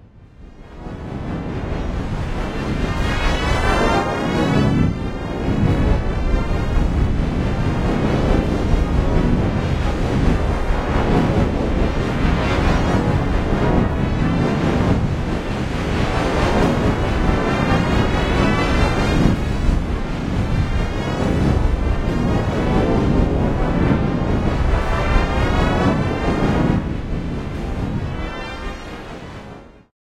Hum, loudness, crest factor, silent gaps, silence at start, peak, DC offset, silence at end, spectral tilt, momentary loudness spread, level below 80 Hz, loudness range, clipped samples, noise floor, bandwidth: none; -19 LUFS; 16 dB; none; 0.15 s; -2 dBFS; under 0.1%; 0.45 s; -7 dB/octave; 8 LU; -24 dBFS; 3 LU; under 0.1%; -41 dBFS; 12 kHz